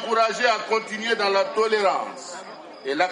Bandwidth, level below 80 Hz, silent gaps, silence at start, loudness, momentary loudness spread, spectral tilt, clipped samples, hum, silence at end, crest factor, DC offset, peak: 11 kHz; -78 dBFS; none; 0 s; -22 LUFS; 16 LU; -2.5 dB/octave; under 0.1%; none; 0 s; 16 dB; under 0.1%; -6 dBFS